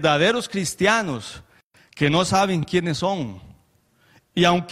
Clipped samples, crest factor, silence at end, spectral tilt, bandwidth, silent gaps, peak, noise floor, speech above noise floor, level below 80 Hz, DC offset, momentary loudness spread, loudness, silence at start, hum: under 0.1%; 18 dB; 0 s; -4.5 dB/octave; 14.5 kHz; 1.63-1.71 s; -4 dBFS; -61 dBFS; 40 dB; -54 dBFS; under 0.1%; 13 LU; -21 LUFS; 0 s; none